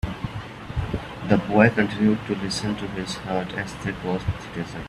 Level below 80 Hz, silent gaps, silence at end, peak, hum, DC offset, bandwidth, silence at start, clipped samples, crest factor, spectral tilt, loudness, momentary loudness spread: -42 dBFS; none; 0 s; -2 dBFS; none; under 0.1%; 12 kHz; 0.05 s; under 0.1%; 22 dB; -6 dB/octave; -25 LUFS; 14 LU